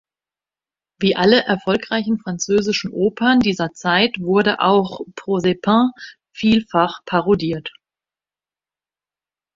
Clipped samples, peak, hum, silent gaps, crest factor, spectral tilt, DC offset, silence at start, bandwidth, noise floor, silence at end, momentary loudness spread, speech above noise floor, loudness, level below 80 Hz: under 0.1%; 0 dBFS; 50 Hz at -45 dBFS; none; 18 dB; -5 dB/octave; under 0.1%; 1 s; 7.6 kHz; under -90 dBFS; 1.85 s; 8 LU; over 72 dB; -18 LUFS; -54 dBFS